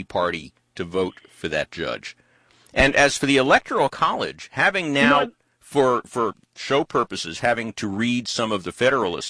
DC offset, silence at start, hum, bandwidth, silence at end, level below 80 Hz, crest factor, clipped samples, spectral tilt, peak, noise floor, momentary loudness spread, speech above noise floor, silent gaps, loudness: under 0.1%; 0 s; none; 11 kHz; 0 s; -46 dBFS; 18 dB; under 0.1%; -4 dB/octave; -4 dBFS; -57 dBFS; 12 LU; 35 dB; none; -21 LUFS